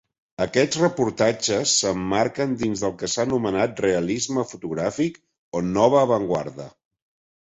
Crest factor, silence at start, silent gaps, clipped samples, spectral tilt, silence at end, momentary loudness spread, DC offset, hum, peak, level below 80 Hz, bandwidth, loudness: 18 dB; 0.4 s; 5.38-5.52 s; under 0.1%; -4 dB/octave; 0.75 s; 9 LU; under 0.1%; none; -4 dBFS; -54 dBFS; 8.4 kHz; -22 LUFS